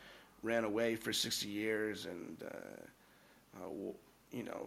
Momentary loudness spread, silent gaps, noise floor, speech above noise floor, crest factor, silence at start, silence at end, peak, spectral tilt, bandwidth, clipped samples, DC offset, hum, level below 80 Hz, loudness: 21 LU; none; -66 dBFS; 26 dB; 20 dB; 0 s; 0 s; -22 dBFS; -3 dB/octave; 16.5 kHz; under 0.1%; under 0.1%; none; -74 dBFS; -40 LUFS